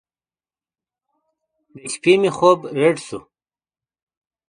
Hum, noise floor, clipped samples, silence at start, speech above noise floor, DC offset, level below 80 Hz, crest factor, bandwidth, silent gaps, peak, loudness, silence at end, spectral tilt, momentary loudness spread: none; under -90 dBFS; under 0.1%; 1.75 s; over 73 dB; under 0.1%; -64 dBFS; 22 dB; 10.5 kHz; none; 0 dBFS; -17 LUFS; 1.3 s; -5 dB/octave; 19 LU